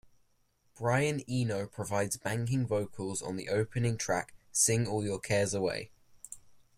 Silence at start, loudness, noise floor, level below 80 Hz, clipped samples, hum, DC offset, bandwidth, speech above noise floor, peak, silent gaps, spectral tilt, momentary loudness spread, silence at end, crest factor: 0.8 s; -32 LUFS; -71 dBFS; -62 dBFS; under 0.1%; none; under 0.1%; 15.5 kHz; 39 dB; -14 dBFS; none; -4.5 dB/octave; 10 LU; 0.2 s; 20 dB